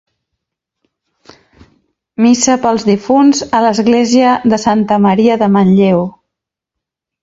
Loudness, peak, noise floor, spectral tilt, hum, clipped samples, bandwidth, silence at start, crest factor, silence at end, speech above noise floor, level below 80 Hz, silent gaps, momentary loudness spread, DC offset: -11 LUFS; 0 dBFS; -80 dBFS; -5.5 dB/octave; none; under 0.1%; 8 kHz; 2.2 s; 12 dB; 1.15 s; 70 dB; -50 dBFS; none; 4 LU; under 0.1%